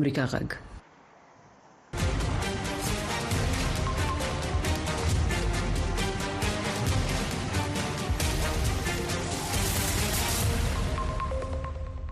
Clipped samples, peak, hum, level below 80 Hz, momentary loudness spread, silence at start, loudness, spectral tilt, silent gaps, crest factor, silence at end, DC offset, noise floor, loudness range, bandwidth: under 0.1%; -12 dBFS; none; -34 dBFS; 5 LU; 0 s; -29 LUFS; -4.5 dB/octave; none; 16 dB; 0 s; under 0.1%; -55 dBFS; 3 LU; 14 kHz